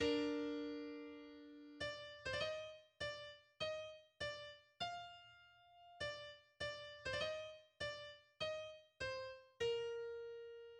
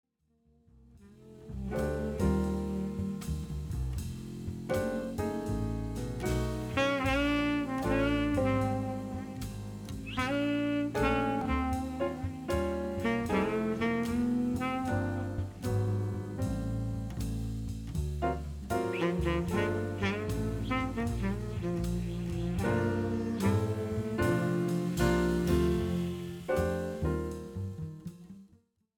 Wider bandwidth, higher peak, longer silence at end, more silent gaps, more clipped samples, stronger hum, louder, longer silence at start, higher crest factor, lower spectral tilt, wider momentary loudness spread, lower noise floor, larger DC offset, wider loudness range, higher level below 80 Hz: second, 10.5 kHz vs 19 kHz; second, -28 dBFS vs -16 dBFS; second, 0 s vs 0.5 s; neither; neither; neither; second, -47 LUFS vs -33 LUFS; second, 0 s vs 0.95 s; about the same, 20 dB vs 16 dB; second, -4 dB/octave vs -6.5 dB/octave; first, 14 LU vs 10 LU; about the same, -67 dBFS vs -70 dBFS; neither; about the same, 3 LU vs 5 LU; second, -72 dBFS vs -44 dBFS